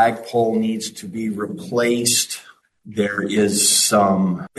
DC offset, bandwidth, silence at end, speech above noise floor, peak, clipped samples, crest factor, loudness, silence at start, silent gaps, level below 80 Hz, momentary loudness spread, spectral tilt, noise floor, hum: under 0.1%; 12.5 kHz; 0.1 s; 22 dB; -4 dBFS; under 0.1%; 16 dB; -18 LUFS; 0 s; none; -62 dBFS; 13 LU; -3 dB/octave; -41 dBFS; none